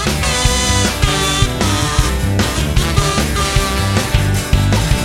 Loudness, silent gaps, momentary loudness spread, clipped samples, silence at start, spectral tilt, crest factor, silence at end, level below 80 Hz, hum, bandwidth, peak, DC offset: -15 LUFS; none; 2 LU; under 0.1%; 0 s; -4 dB/octave; 14 dB; 0 s; -20 dBFS; none; 16.5 kHz; 0 dBFS; under 0.1%